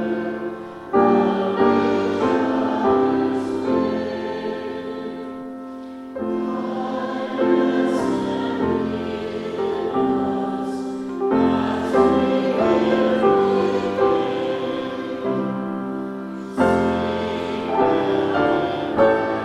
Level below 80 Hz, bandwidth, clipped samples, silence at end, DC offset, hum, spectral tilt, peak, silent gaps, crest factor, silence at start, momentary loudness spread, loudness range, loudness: -56 dBFS; 11 kHz; under 0.1%; 0 s; under 0.1%; none; -7 dB/octave; -2 dBFS; none; 18 dB; 0 s; 12 LU; 6 LU; -21 LUFS